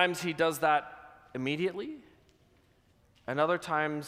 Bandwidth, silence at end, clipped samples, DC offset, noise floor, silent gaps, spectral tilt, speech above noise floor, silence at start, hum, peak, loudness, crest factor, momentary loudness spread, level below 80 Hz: 15.5 kHz; 0 s; under 0.1%; under 0.1%; -66 dBFS; none; -4.5 dB/octave; 36 dB; 0 s; none; -10 dBFS; -31 LUFS; 22 dB; 19 LU; -70 dBFS